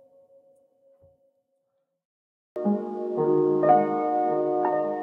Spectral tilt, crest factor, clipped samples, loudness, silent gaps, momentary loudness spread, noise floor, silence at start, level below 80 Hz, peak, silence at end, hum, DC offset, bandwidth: -10.5 dB/octave; 20 dB; under 0.1%; -24 LUFS; none; 9 LU; -76 dBFS; 2.55 s; -84 dBFS; -6 dBFS; 0 s; none; under 0.1%; 3.9 kHz